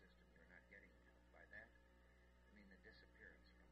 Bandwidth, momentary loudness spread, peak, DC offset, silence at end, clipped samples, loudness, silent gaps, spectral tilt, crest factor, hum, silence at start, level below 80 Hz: 8 kHz; 6 LU; -50 dBFS; under 0.1%; 0 s; under 0.1%; -66 LUFS; none; -3.5 dB/octave; 18 dB; 60 Hz at -75 dBFS; 0 s; -74 dBFS